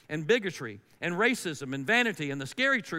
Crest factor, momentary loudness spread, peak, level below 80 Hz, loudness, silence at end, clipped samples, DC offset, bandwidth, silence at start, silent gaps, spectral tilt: 18 dB; 11 LU; -10 dBFS; -76 dBFS; -28 LUFS; 0 s; under 0.1%; under 0.1%; 16 kHz; 0.1 s; none; -4 dB/octave